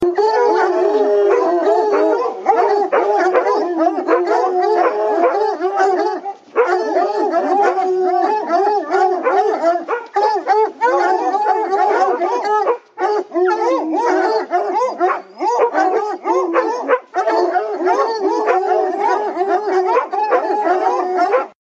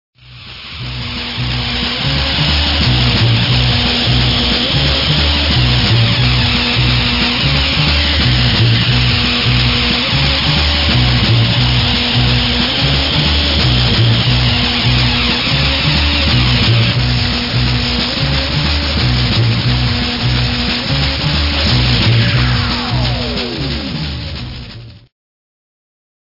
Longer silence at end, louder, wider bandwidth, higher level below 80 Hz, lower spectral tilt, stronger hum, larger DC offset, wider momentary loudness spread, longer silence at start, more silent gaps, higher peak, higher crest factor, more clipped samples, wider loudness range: second, 0.15 s vs 1.3 s; second, -16 LUFS vs -12 LUFS; first, 7.8 kHz vs 5.8 kHz; second, -68 dBFS vs -22 dBFS; second, -3.5 dB/octave vs -5.5 dB/octave; neither; neither; second, 4 LU vs 7 LU; second, 0 s vs 0.25 s; neither; about the same, 0 dBFS vs 0 dBFS; about the same, 14 dB vs 14 dB; neither; about the same, 2 LU vs 3 LU